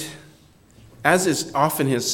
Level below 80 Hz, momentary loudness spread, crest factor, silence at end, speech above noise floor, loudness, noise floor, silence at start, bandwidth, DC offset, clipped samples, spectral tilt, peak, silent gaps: -58 dBFS; 5 LU; 22 dB; 0 s; 32 dB; -20 LUFS; -52 dBFS; 0 s; 17.5 kHz; under 0.1%; under 0.1%; -4 dB/octave; -2 dBFS; none